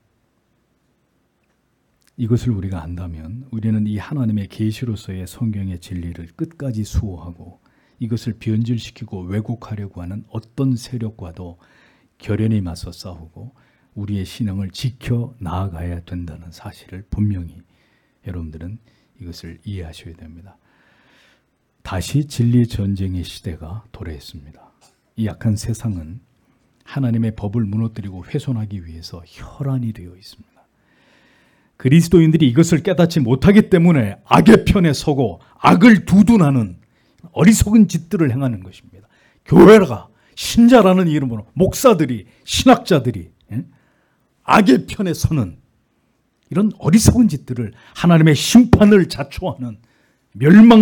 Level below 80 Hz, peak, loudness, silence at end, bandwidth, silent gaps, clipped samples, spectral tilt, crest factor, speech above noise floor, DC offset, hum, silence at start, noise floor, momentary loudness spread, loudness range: -40 dBFS; 0 dBFS; -16 LUFS; 0 s; 18 kHz; none; under 0.1%; -6.5 dB/octave; 16 dB; 48 dB; under 0.1%; none; 2.2 s; -64 dBFS; 22 LU; 15 LU